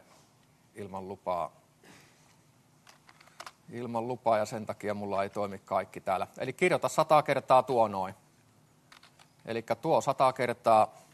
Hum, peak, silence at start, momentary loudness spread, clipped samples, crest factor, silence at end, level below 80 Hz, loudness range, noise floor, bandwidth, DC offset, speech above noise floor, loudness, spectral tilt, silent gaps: none; -10 dBFS; 0.75 s; 17 LU; under 0.1%; 22 dB; 0.2 s; -76 dBFS; 13 LU; -64 dBFS; 13 kHz; under 0.1%; 35 dB; -29 LUFS; -5 dB/octave; none